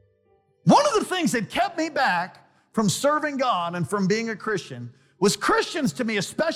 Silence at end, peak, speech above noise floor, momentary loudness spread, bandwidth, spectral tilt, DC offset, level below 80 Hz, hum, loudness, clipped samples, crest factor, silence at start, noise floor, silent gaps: 0 s; -6 dBFS; 40 dB; 10 LU; 16 kHz; -4.5 dB/octave; under 0.1%; -60 dBFS; none; -23 LUFS; under 0.1%; 18 dB; 0.65 s; -64 dBFS; none